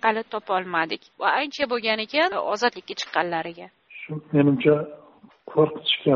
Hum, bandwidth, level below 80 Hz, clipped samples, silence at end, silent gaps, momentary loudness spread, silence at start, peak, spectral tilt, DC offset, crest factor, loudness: none; 7 kHz; -66 dBFS; under 0.1%; 0 s; none; 15 LU; 0.05 s; -4 dBFS; -3 dB/octave; under 0.1%; 20 dB; -23 LUFS